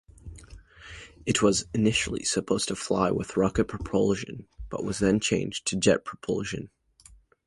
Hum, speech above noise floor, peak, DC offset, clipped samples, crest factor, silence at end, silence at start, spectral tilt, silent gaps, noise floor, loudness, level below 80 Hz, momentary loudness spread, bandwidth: none; 29 dB; -6 dBFS; under 0.1%; under 0.1%; 20 dB; 0.8 s; 0.25 s; -4.5 dB/octave; none; -56 dBFS; -26 LUFS; -48 dBFS; 20 LU; 11.5 kHz